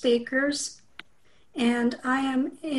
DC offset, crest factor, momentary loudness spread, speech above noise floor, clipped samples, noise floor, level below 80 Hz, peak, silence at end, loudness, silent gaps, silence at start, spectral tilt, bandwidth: 0.2%; 16 dB; 11 LU; 39 dB; under 0.1%; -64 dBFS; -66 dBFS; -12 dBFS; 0 s; -26 LUFS; none; 0 s; -3 dB/octave; 12 kHz